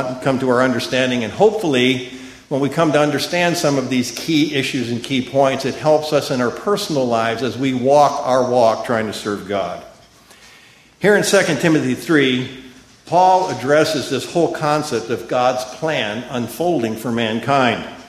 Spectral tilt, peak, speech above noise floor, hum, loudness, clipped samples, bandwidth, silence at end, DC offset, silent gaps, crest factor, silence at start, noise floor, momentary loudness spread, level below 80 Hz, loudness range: -4.5 dB/octave; 0 dBFS; 30 dB; none; -17 LUFS; under 0.1%; 15 kHz; 0 s; under 0.1%; none; 18 dB; 0 s; -47 dBFS; 8 LU; -54 dBFS; 3 LU